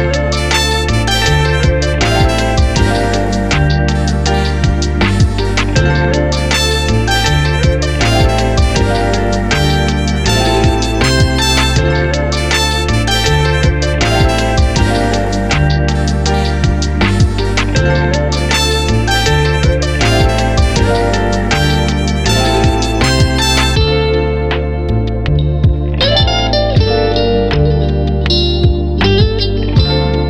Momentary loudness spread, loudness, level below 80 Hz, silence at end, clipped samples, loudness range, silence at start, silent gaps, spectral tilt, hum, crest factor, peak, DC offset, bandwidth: 3 LU; -12 LUFS; -18 dBFS; 0 s; under 0.1%; 1 LU; 0 s; none; -5 dB/octave; none; 12 dB; 0 dBFS; 3%; 15 kHz